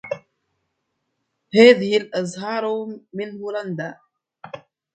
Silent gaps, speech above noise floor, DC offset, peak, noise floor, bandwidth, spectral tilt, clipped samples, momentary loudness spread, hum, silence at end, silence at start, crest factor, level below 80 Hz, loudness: none; 56 dB; under 0.1%; 0 dBFS; -75 dBFS; 9 kHz; -5 dB/octave; under 0.1%; 26 LU; none; 0.35 s; 0.05 s; 22 dB; -68 dBFS; -19 LUFS